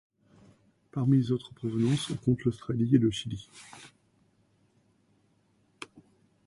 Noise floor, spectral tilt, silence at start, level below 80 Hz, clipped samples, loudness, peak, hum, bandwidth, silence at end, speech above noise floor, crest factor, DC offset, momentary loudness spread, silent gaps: -69 dBFS; -7 dB/octave; 0.95 s; -60 dBFS; under 0.1%; -29 LUFS; -10 dBFS; none; 11.5 kHz; 0.45 s; 41 dB; 20 dB; under 0.1%; 22 LU; none